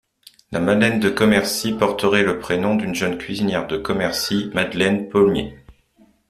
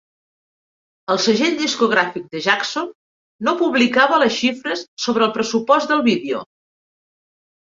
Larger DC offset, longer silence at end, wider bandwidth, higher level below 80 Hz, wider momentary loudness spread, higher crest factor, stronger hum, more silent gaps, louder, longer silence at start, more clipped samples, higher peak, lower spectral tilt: neither; second, 0.6 s vs 1.2 s; first, 14.5 kHz vs 7.6 kHz; first, -48 dBFS vs -66 dBFS; second, 7 LU vs 11 LU; about the same, 18 dB vs 18 dB; neither; second, none vs 2.95-3.39 s, 4.88-4.97 s; about the same, -19 LUFS vs -18 LUFS; second, 0.5 s vs 1.1 s; neither; about the same, -2 dBFS vs -2 dBFS; first, -5 dB/octave vs -3.5 dB/octave